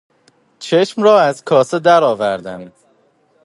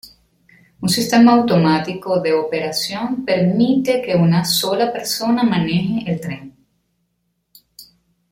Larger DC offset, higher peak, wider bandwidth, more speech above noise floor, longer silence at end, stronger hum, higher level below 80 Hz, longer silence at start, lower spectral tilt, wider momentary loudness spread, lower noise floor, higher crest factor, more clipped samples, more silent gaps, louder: neither; about the same, 0 dBFS vs -2 dBFS; second, 11.5 kHz vs 16.5 kHz; second, 43 dB vs 53 dB; first, 0.75 s vs 0.5 s; neither; second, -64 dBFS vs -54 dBFS; first, 0.6 s vs 0.05 s; about the same, -5 dB/octave vs -5.5 dB/octave; first, 18 LU vs 10 LU; second, -56 dBFS vs -70 dBFS; about the same, 16 dB vs 16 dB; neither; neither; first, -14 LUFS vs -17 LUFS